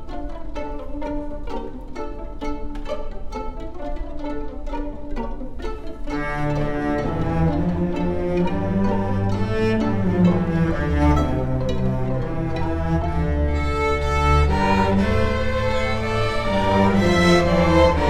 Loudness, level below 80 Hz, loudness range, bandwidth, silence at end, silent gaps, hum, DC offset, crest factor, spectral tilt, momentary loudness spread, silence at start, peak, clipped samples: -22 LUFS; -28 dBFS; 12 LU; 12 kHz; 0 s; none; none; under 0.1%; 16 dB; -7 dB/octave; 15 LU; 0 s; -4 dBFS; under 0.1%